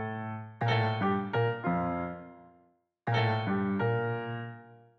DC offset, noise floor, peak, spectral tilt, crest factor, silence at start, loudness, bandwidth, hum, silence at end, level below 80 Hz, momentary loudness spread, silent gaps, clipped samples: under 0.1%; -67 dBFS; -14 dBFS; -8.5 dB/octave; 16 dB; 0 s; -31 LUFS; 6.2 kHz; none; 0.2 s; -66 dBFS; 12 LU; none; under 0.1%